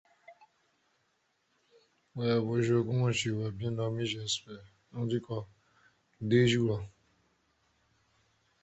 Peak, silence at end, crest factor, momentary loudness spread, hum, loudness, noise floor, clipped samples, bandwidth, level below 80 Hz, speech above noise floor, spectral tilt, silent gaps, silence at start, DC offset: -14 dBFS; 1.75 s; 20 dB; 20 LU; none; -31 LUFS; -76 dBFS; under 0.1%; 8.2 kHz; -64 dBFS; 45 dB; -5.5 dB/octave; none; 0.3 s; under 0.1%